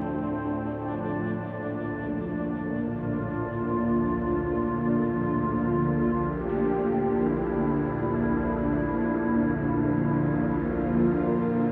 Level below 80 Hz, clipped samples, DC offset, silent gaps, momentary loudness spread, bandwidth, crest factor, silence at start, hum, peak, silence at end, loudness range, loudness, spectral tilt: -42 dBFS; under 0.1%; under 0.1%; none; 6 LU; 3.7 kHz; 14 dB; 0 s; none; -12 dBFS; 0 s; 4 LU; -27 LUFS; -12 dB/octave